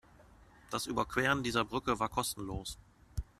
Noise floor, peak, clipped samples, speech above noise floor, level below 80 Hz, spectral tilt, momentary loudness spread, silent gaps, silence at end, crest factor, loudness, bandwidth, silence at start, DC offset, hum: -60 dBFS; -14 dBFS; under 0.1%; 25 dB; -52 dBFS; -4 dB/octave; 15 LU; none; 0.15 s; 22 dB; -34 LUFS; 15 kHz; 0.2 s; under 0.1%; none